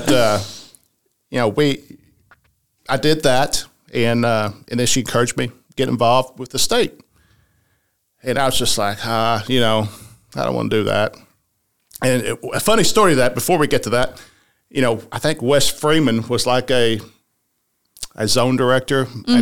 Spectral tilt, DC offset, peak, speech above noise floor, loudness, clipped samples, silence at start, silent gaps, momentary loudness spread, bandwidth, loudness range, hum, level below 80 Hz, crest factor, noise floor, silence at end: -4 dB/octave; 2%; -4 dBFS; 52 dB; -18 LUFS; under 0.1%; 0 s; none; 9 LU; 19 kHz; 3 LU; none; -44 dBFS; 16 dB; -69 dBFS; 0 s